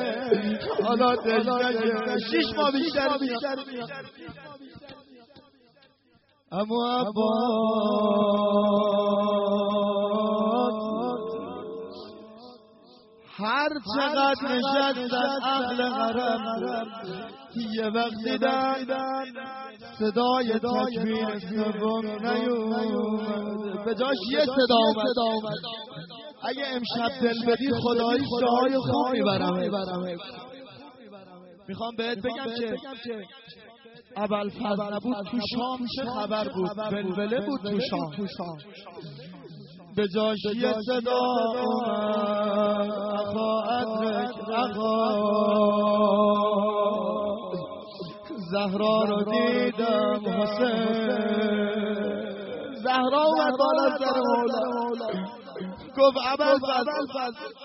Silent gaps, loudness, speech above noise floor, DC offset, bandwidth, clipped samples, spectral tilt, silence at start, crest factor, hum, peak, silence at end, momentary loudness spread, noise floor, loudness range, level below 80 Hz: none; -26 LUFS; 38 dB; under 0.1%; 6 kHz; under 0.1%; -3.5 dB/octave; 0 s; 18 dB; none; -8 dBFS; 0 s; 15 LU; -64 dBFS; 8 LU; -66 dBFS